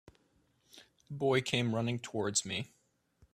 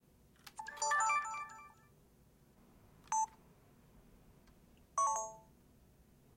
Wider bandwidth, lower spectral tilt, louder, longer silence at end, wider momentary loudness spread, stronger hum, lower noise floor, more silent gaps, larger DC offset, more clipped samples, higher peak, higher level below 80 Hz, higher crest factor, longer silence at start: second, 14.5 kHz vs 16.5 kHz; first, -4 dB/octave vs -0.5 dB/octave; first, -33 LUFS vs -37 LUFS; second, 0.65 s vs 0.95 s; second, 11 LU vs 24 LU; neither; first, -73 dBFS vs -67 dBFS; neither; neither; neither; first, -12 dBFS vs -24 dBFS; about the same, -70 dBFS vs -72 dBFS; about the same, 24 dB vs 20 dB; first, 0.75 s vs 0.45 s